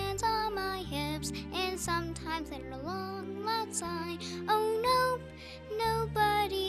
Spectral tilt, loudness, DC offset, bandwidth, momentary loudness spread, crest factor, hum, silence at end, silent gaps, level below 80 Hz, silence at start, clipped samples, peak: -4 dB/octave; -33 LUFS; under 0.1%; 15.5 kHz; 10 LU; 16 dB; none; 0 s; none; -50 dBFS; 0 s; under 0.1%; -18 dBFS